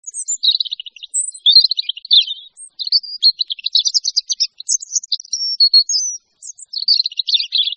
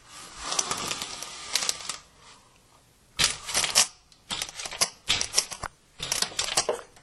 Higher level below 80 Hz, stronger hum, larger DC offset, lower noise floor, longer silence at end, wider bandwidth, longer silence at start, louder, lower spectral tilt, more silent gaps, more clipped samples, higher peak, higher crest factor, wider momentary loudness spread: second, -82 dBFS vs -54 dBFS; neither; neither; second, -38 dBFS vs -59 dBFS; second, 0 s vs 0.15 s; second, 9.4 kHz vs 16 kHz; about the same, 0.05 s vs 0.05 s; first, -14 LUFS vs -27 LUFS; second, 10 dB/octave vs 0.5 dB/octave; neither; neither; first, 0 dBFS vs -4 dBFS; second, 18 dB vs 26 dB; about the same, 13 LU vs 15 LU